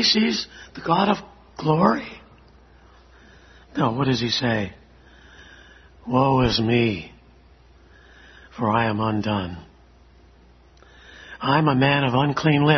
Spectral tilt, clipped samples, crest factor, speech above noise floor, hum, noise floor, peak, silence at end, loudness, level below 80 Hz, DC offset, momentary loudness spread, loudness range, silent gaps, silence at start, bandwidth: -6 dB/octave; under 0.1%; 22 dB; 31 dB; none; -52 dBFS; -2 dBFS; 0 s; -21 LUFS; -48 dBFS; under 0.1%; 18 LU; 5 LU; none; 0 s; 6.4 kHz